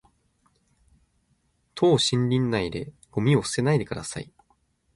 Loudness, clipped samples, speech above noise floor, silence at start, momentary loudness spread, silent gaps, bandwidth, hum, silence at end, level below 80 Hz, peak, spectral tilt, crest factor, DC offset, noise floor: -24 LUFS; under 0.1%; 45 dB; 1.75 s; 16 LU; none; 11.5 kHz; none; 0.7 s; -54 dBFS; -8 dBFS; -5.5 dB/octave; 18 dB; under 0.1%; -69 dBFS